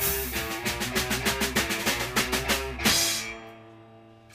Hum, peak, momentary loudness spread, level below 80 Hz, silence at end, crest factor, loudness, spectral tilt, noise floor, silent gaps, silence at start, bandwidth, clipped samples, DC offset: none; -8 dBFS; 7 LU; -42 dBFS; 0 s; 20 dB; -26 LUFS; -2 dB/octave; -51 dBFS; none; 0 s; 16 kHz; under 0.1%; under 0.1%